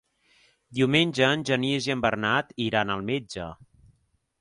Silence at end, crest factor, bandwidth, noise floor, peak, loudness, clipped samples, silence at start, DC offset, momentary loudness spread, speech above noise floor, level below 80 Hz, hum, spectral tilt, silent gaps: 0.85 s; 20 dB; 11.5 kHz; -69 dBFS; -8 dBFS; -25 LUFS; under 0.1%; 0.7 s; under 0.1%; 14 LU; 43 dB; -58 dBFS; none; -5 dB/octave; none